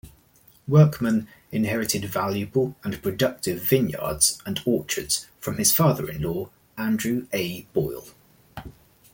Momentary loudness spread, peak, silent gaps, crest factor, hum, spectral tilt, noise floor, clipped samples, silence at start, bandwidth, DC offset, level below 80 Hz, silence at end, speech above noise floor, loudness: 14 LU; -4 dBFS; none; 20 dB; none; -4.5 dB/octave; -57 dBFS; under 0.1%; 0.05 s; 17 kHz; under 0.1%; -52 dBFS; 0.4 s; 33 dB; -24 LUFS